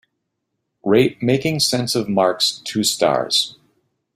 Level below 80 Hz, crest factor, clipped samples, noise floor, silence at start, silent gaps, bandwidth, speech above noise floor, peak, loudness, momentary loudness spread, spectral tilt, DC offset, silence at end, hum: -58 dBFS; 18 dB; under 0.1%; -75 dBFS; 0.85 s; none; 16 kHz; 57 dB; -2 dBFS; -18 LUFS; 4 LU; -4 dB/octave; under 0.1%; 0.65 s; none